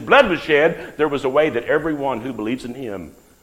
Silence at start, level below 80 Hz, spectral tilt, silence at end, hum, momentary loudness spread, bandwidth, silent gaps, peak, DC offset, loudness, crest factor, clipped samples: 0 s; -48 dBFS; -5.5 dB/octave; 0.3 s; none; 15 LU; 15.5 kHz; none; 0 dBFS; under 0.1%; -19 LUFS; 18 dB; under 0.1%